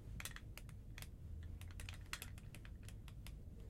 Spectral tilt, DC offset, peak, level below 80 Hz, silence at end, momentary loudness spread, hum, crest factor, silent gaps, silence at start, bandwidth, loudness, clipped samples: -3.5 dB/octave; under 0.1%; -26 dBFS; -56 dBFS; 0 s; 6 LU; none; 26 dB; none; 0 s; 16 kHz; -53 LUFS; under 0.1%